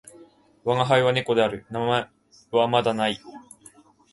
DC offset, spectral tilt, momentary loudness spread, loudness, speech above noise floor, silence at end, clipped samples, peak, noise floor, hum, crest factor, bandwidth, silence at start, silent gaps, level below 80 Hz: under 0.1%; -5.5 dB/octave; 16 LU; -23 LUFS; 31 dB; 0.7 s; under 0.1%; -4 dBFS; -53 dBFS; none; 20 dB; 11.5 kHz; 0.2 s; none; -62 dBFS